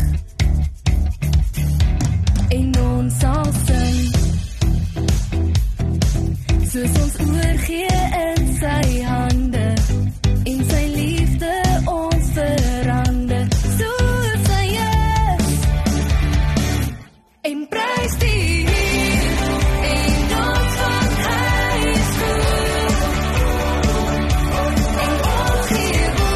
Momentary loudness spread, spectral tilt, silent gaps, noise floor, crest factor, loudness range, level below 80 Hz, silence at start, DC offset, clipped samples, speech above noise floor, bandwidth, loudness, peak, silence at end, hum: 3 LU; -5.5 dB/octave; none; -40 dBFS; 12 dB; 2 LU; -20 dBFS; 0 s; under 0.1%; under 0.1%; 22 dB; 13.5 kHz; -18 LUFS; -4 dBFS; 0 s; none